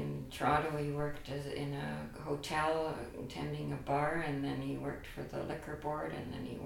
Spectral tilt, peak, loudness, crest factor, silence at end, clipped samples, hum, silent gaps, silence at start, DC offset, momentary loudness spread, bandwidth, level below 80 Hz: -6 dB/octave; -16 dBFS; -38 LUFS; 22 dB; 0 s; under 0.1%; none; none; 0 s; under 0.1%; 9 LU; 17 kHz; -54 dBFS